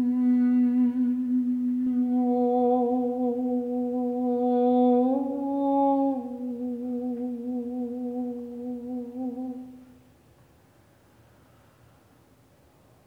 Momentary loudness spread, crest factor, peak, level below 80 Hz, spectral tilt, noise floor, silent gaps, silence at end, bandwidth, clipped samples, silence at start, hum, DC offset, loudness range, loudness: 12 LU; 14 dB; -12 dBFS; -68 dBFS; -9 dB/octave; -59 dBFS; none; 3.2 s; 3.8 kHz; under 0.1%; 0 s; none; under 0.1%; 14 LU; -26 LUFS